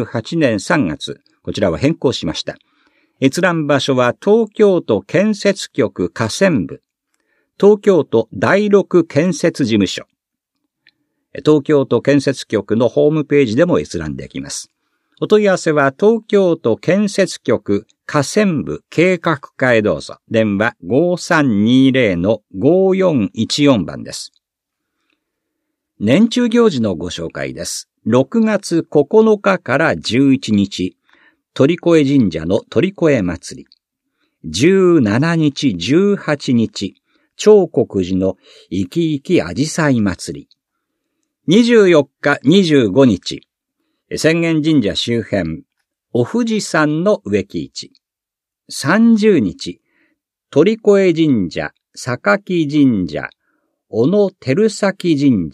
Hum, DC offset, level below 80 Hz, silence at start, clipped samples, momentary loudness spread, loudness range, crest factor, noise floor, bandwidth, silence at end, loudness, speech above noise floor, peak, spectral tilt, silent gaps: none; under 0.1%; -50 dBFS; 0 s; under 0.1%; 13 LU; 4 LU; 16 dB; -85 dBFS; 13 kHz; 0.05 s; -15 LUFS; 71 dB; 0 dBFS; -6 dB/octave; none